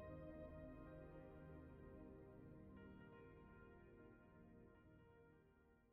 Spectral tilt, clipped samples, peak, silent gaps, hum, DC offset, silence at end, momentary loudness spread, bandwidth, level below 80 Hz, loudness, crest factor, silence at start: -8 dB/octave; under 0.1%; -44 dBFS; none; none; under 0.1%; 0 s; 10 LU; 4.2 kHz; -70 dBFS; -62 LUFS; 16 dB; 0 s